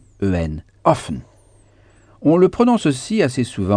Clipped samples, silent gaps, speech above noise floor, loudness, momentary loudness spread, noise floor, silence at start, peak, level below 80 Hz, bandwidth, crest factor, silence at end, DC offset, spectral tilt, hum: under 0.1%; none; 34 dB; -18 LUFS; 10 LU; -51 dBFS; 0.2 s; 0 dBFS; -42 dBFS; 10 kHz; 18 dB; 0 s; under 0.1%; -6.5 dB/octave; none